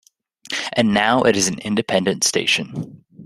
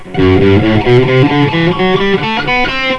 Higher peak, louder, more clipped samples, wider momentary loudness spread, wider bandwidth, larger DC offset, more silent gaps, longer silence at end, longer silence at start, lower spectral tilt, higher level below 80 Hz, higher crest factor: about the same, 0 dBFS vs 0 dBFS; second, -18 LUFS vs -10 LUFS; second, under 0.1% vs 0.4%; first, 13 LU vs 4 LU; first, 13.5 kHz vs 8.2 kHz; neither; neither; about the same, 0 s vs 0 s; first, 0.5 s vs 0 s; second, -3 dB/octave vs -7.5 dB/octave; second, -56 dBFS vs -28 dBFS; first, 20 dB vs 10 dB